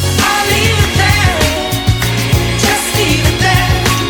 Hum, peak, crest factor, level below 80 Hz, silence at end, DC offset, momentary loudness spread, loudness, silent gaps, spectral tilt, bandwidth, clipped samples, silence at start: none; 0 dBFS; 12 dB; -24 dBFS; 0 s; under 0.1%; 3 LU; -11 LUFS; none; -4 dB/octave; over 20 kHz; under 0.1%; 0 s